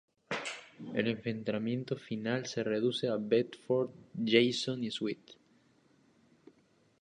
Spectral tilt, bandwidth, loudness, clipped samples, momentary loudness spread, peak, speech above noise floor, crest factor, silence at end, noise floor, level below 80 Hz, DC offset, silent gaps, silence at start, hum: -5 dB/octave; 10.5 kHz; -34 LUFS; under 0.1%; 11 LU; -10 dBFS; 36 dB; 24 dB; 1.7 s; -69 dBFS; -76 dBFS; under 0.1%; none; 0.3 s; none